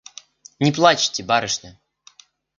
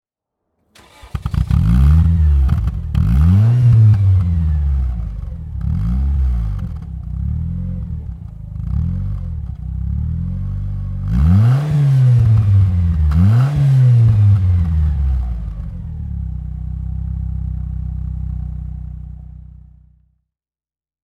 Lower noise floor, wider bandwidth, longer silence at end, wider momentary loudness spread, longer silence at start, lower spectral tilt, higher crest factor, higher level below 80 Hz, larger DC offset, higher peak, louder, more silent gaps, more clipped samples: second, -52 dBFS vs under -90 dBFS; first, 9.2 kHz vs 5.2 kHz; second, 0.9 s vs 1.5 s; second, 11 LU vs 16 LU; second, 0.6 s vs 1.05 s; second, -3.5 dB/octave vs -9.5 dB/octave; first, 22 dB vs 14 dB; second, -60 dBFS vs -22 dBFS; neither; about the same, 0 dBFS vs -2 dBFS; second, -19 LUFS vs -16 LUFS; neither; neither